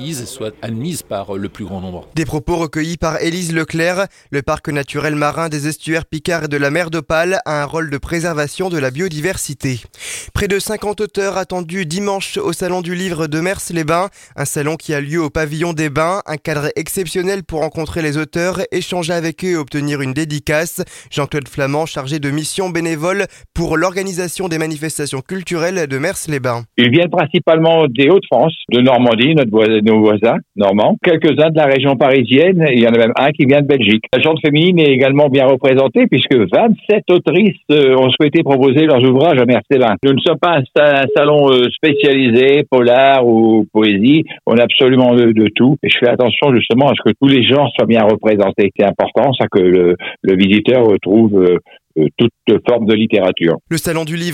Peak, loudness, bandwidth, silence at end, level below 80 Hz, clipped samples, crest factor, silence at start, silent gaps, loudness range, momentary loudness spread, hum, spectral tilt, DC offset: 0 dBFS; -13 LUFS; 16.5 kHz; 0 s; -42 dBFS; under 0.1%; 12 dB; 0 s; none; 8 LU; 10 LU; none; -5.5 dB/octave; under 0.1%